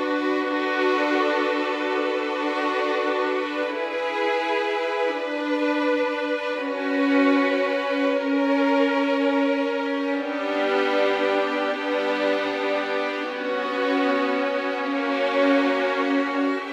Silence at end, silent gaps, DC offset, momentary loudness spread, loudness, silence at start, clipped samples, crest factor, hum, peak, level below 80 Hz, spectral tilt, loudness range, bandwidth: 0 s; none; under 0.1%; 5 LU; -23 LUFS; 0 s; under 0.1%; 14 dB; none; -8 dBFS; -76 dBFS; -3.5 dB/octave; 3 LU; 9 kHz